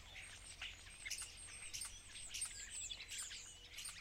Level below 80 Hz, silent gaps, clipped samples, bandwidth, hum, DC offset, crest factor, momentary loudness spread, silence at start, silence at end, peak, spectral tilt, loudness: -64 dBFS; none; under 0.1%; 16 kHz; none; under 0.1%; 20 dB; 7 LU; 0 s; 0 s; -32 dBFS; 1 dB/octave; -48 LUFS